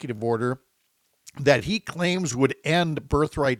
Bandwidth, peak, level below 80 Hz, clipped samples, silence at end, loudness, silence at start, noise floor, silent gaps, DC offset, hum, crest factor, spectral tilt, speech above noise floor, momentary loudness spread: 15.5 kHz; -4 dBFS; -46 dBFS; under 0.1%; 0 s; -24 LUFS; 0 s; -70 dBFS; none; under 0.1%; none; 20 dB; -5 dB/octave; 46 dB; 7 LU